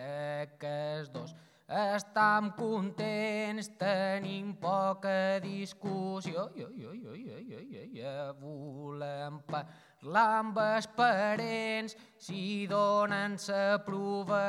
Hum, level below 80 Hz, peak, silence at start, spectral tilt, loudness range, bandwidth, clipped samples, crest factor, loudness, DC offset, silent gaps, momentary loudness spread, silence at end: none; -84 dBFS; -14 dBFS; 0 s; -5.5 dB/octave; 10 LU; 13 kHz; under 0.1%; 18 dB; -33 LUFS; under 0.1%; none; 17 LU; 0 s